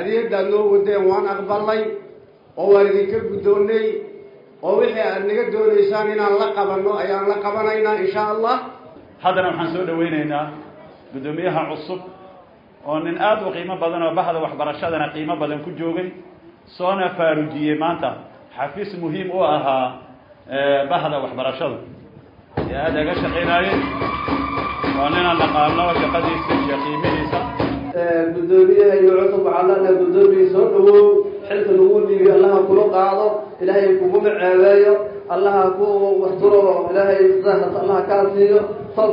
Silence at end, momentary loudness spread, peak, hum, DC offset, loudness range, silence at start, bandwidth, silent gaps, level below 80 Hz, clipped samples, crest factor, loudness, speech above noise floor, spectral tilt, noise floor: 0 s; 13 LU; -2 dBFS; none; under 0.1%; 9 LU; 0 s; 5.4 kHz; none; -48 dBFS; under 0.1%; 16 dB; -17 LUFS; 30 dB; -9 dB/octave; -46 dBFS